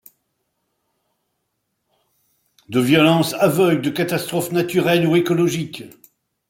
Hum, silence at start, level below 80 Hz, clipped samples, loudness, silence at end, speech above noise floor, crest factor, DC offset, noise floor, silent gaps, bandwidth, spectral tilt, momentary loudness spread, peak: none; 2.7 s; -62 dBFS; under 0.1%; -18 LUFS; 0.6 s; 56 dB; 18 dB; under 0.1%; -74 dBFS; none; 17 kHz; -5.5 dB/octave; 9 LU; -2 dBFS